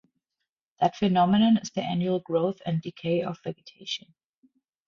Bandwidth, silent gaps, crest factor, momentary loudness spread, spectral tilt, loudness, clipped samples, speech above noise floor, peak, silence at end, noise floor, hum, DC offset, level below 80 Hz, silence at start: 7.2 kHz; none; 18 dB; 13 LU; -6.5 dB/octave; -26 LUFS; under 0.1%; 59 dB; -8 dBFS; 0.9 s; -85 dBFS; none; under 0.1%; -64 dBFS; 0.8 s